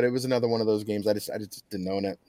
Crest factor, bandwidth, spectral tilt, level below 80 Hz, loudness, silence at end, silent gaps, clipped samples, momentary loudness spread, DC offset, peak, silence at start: 16 dB; 16.5 kHz; -5.5 dB/octave; -72 dBFS; -28 LUFS; 0.15 s; none; under 0.1%; 10 LU; under 0.1%; -12 dBFS; 0 s